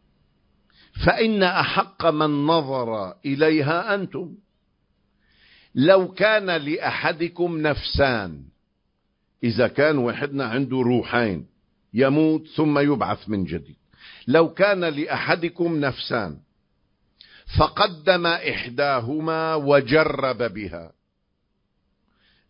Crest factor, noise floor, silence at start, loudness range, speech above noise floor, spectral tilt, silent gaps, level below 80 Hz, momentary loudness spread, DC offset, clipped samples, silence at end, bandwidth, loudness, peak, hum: 22 dB; -72 dBFS; 0.95 s; 3 LU; 51 dB; -10.5 dB/octave; none; -44 dBFS; 10 LU; under 0.1%; under 0.1%; 1.65 s; 5.4 kHz; -21 LUFS; -2 dBFS; none